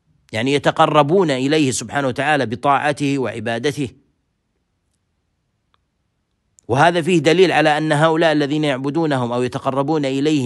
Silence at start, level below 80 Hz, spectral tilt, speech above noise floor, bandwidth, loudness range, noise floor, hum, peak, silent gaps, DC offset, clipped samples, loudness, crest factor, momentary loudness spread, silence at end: 0.3 s; -60 dBFS; -5.5 dB/octave; 53 dB; 12.5 kHz; 11 LU; -69 dBFS; none; -2 dBFS; none; under 0.1%; under 0.1%; -17 LUFS; 18 dB; 8 LU; 0 s